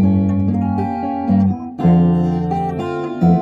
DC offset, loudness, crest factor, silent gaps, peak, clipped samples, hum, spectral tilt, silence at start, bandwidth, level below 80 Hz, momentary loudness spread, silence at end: under 0.1%; -17 LUFS; 12 dB; none; -4 dBFS; under 0.1%; none; -10.5 dB/octave; 0 s; 4.7 kHz; -42 dBFS; 7 LU; 0 s